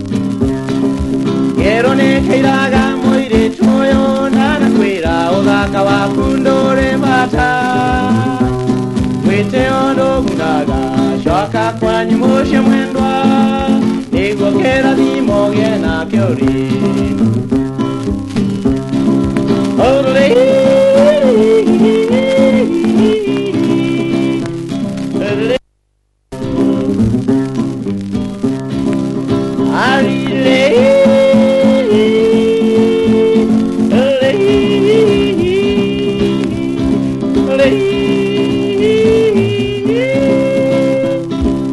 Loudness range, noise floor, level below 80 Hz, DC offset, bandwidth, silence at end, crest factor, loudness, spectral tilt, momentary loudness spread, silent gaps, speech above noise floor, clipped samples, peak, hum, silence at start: 5 LU; -61 dBFS; -32 dBFS; under 0.1%; 11.5 kHz; 0 s; 12 dB; -12 LUFS; -6.5 dB/octave; 7 LU; none; 50 dB; under 0.1%; 0 dBFS; none; 0 s